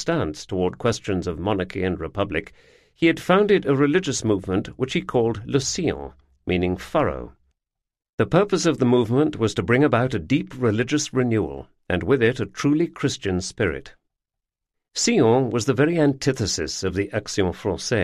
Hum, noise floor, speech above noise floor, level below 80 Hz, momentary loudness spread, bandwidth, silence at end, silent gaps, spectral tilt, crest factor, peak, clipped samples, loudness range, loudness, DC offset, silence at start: none; -85 dBFS; 63 dB; -44 dBFS; 8 LU; 13.5 kHz; 0 s; 8.13-8.18 s; -5 dB/octave; 20 dB; -4 dBFS; under 0.1%; 4 LU; -22 LUFS; under 0.1%; 0 s